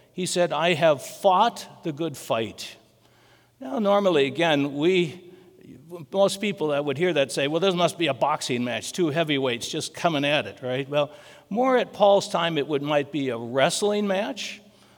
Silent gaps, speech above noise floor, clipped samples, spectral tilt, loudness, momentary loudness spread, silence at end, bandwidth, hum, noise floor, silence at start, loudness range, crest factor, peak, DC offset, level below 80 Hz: none; 34 dB; under 0.1%; -4.5 dB/octave; -24 LUFS; 11 LU; 0.4 s; over 20 kHz; none; -58 dBFS; 0.15 s; 2 LU; 20 dB; -4 dBFS; under 0.1%; -74 dBFS